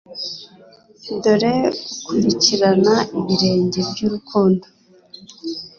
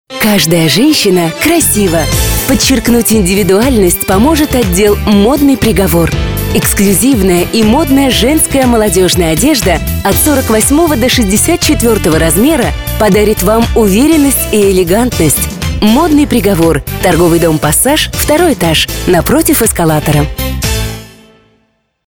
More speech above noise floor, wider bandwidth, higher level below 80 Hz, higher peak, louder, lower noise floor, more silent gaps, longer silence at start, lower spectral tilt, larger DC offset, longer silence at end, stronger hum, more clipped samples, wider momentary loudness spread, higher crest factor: second, 30 dB vs 49 dB; second, 7.2 kHz vs over 20 kHz; second, -56 dBFS vs -22 dBFS; about the same, -2 dBFS vs 0 dBFS; second, -18 LUFS vs -8 LUFS; second, -47 dBFS vs -57 dBFS; neither; about the same, 0.1 s vs 0.1 s; about the same, -5 dB/octave vs -4.5 dB/octave; second, under 0.1% vs 0.7%; second, 0.1 s vs 1 s; neither; neither; first, 15 LU vs 4 LU; first, 16 dB vs 8 dB